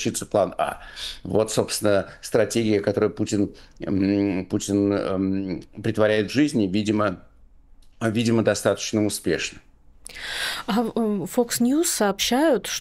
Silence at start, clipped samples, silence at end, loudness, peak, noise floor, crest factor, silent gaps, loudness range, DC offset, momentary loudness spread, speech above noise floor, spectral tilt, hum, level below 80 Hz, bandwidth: 0 s; under 0.1%; 0 s; -23 LUFS; -6 dBFS; -50 dBFS; 18 dB; none; 2 LU; under 0.1%; 8 LU; 27 dB; -4.5 dB/octave; none; -52 dBFS; 16 kHz